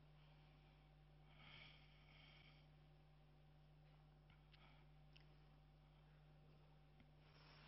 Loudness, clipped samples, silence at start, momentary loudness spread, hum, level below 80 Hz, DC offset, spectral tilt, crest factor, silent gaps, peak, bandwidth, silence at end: -67 LUFS; under 0.1%; 0 s; 6 LU; none; -74 dBFS; under 0.1%; -4 dB/octave; 18 dB; none; -50 dBFS; 5.6 kHz; 0 s